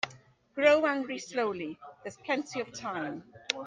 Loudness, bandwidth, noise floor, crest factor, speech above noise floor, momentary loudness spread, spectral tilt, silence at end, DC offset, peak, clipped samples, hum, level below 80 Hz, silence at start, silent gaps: -31 LUFS; 9.6 kHz; -57 dBFS; 22 dB; 26 dB; 19 LU; -3.5 dB/octave; 0 s; under 0.1%; -10 dBFS; under 0.1%; none; -76 dBFS; 0.05 s; none